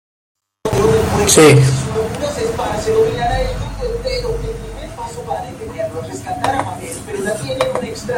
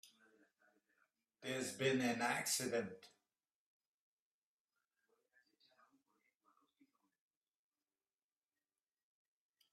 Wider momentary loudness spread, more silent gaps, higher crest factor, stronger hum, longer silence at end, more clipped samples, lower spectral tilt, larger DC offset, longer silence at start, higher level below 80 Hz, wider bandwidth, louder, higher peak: about the same, 16 LU vs 14 LU; neither; second, 16 dB vs 22 dB; neither; second, 0 s vs 6.65 s; neither; first, -4.5 dB/octave vs -3 dB/octave; neither; first, 0.65 s vs 0.05 s; first, -32 dBFS vs -90 dBFS; first, 16.5 kHz vs 14 kHz; first, -16 LUFS vs -40 LUFS; first, 0 dBFS vs -26 dBFS